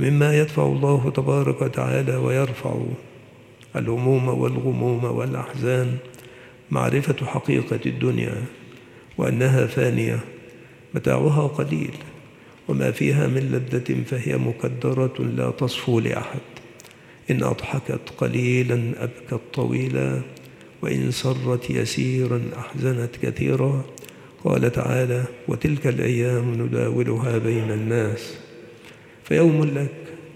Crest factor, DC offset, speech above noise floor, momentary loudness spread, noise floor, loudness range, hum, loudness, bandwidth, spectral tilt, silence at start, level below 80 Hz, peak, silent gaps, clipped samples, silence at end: 18 dB; under 0.1%; 25 dB; 12 LU; -47 dBFS; 2 LU; none; -23 LUFS; 14.5 kHz; -7 dB/octave; 0 s; -56 dBFS; -4 dBFS; none; under 0.1%; 0 s